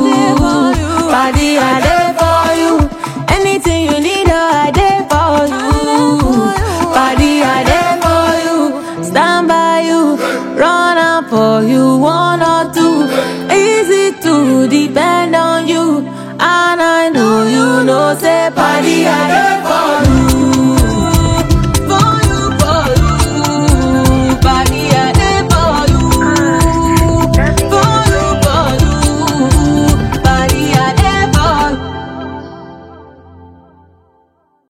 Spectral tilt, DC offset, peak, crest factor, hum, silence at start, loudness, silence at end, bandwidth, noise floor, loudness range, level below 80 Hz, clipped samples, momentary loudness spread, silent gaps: -5 dB/octave; under 0.1%; 0 dBFS; 10 dB; none; 0 s; -11 LUFS; 1.25 s; 17 kHz; -55 dBFS; 1 LU; -20 dBFS; under 0.1%; 3 LU; none